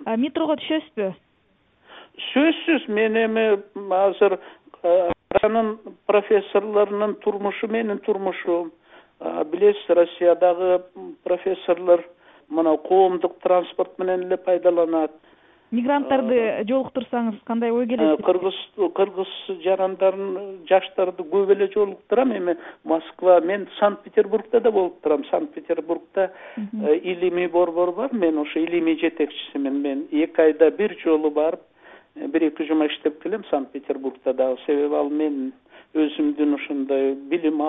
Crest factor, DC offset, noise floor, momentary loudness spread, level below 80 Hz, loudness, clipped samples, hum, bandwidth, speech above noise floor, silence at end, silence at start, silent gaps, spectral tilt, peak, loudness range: 18 dB; under 0.1%; -63 dBFS; 9 LU; -64 dBFS; -22 LUFS; under 0.1%; none; 4 kHz; 42 dB; 0 s; 0 s; none; -10 dB/octave; -4 dBFS; 3 LU